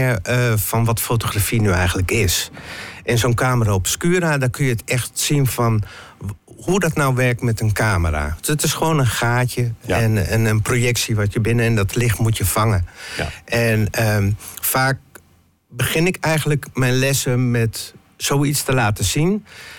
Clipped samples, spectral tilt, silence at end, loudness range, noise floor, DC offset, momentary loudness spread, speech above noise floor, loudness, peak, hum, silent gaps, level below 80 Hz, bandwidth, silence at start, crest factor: under 0.1%; -5 dB/octave; 0 s; 2 LU; -55 dBFS; under 0.1%; 7 LU; 37 dB; -19 LUFS; -8 dBFS; none; none; -38 dBFS; 17.5 kHz; 0 s; 10 dB